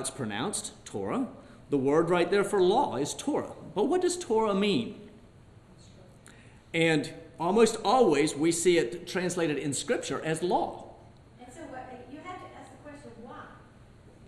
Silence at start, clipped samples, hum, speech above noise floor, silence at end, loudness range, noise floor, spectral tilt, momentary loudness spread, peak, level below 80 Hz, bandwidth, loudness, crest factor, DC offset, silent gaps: 0 s; under 0.1%; none; 27 dB; 0 s; 9 LU; -54 dBFS; -4.5 dB/octave; 22 LU; -8 dBFS; -60 dBFS; 13 kHz; -28 LUFS; 20 dB; under 0.1%; none